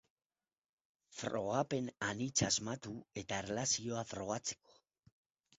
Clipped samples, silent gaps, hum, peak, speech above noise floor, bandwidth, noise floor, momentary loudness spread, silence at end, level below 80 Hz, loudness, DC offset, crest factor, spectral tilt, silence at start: under 0.1%; none; none; -20 dBFS; over 51 dB; 8 kHz; under -90 dBFS; 11 LU; 1.05 s; -68 dBFS; -38 LUFS; under 0.1%; 22 dB; -4 dB/octave; 1.1 s